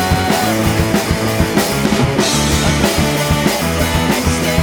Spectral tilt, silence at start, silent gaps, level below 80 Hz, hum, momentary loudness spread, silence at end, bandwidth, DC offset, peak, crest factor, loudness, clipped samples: -4.5 dB/octave; 0 s; none; -26 dBFS; none; 2 LU; 0 s; over 20 kHz; under 0.1%; 0 dBFS; 14 dB; -14 LUFS; under 0.1%